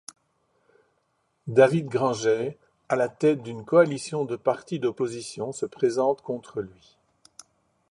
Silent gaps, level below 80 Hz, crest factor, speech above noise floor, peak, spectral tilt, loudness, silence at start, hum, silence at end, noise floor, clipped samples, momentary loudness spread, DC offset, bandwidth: none; -68 dBFS; 22 dB; 48 dB; -4 dBFS; -6 dB/octave; -25 LUFS; 1.45 s; none; 1.2 s; -72 dBFS; under 0.1%; 13 LU; under 0.1%; 11.5 kHz